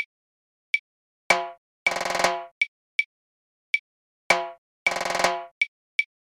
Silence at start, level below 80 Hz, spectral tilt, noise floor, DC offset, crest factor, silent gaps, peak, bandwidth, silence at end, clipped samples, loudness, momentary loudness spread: 0 s; -62 dBFS; -1 dB/octave; under -90 dBFS; under 0.1%; 24 dB; 0.06-1.30 s, 1.58-1.86 s, 2.51-2.61 s, 2.68-2.99 s, 3.06-4.30 s, 4.58-4.86 s, 5.51-5.61 s, 5.68-5.99 s; -4 dBFS; 18 kHz; 0.3 s; under 0.1%; -26 LUFS; 4 LU